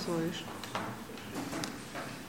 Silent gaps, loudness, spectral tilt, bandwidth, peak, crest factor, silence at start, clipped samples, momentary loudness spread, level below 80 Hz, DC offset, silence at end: none; -39 LUFS; -4.5 dB/octave; 16.5 kHz; -18 dBFS; 20 dB; 0 s; under 0.1%; 7 LU; -64 dBFS; 0.1%; 0 s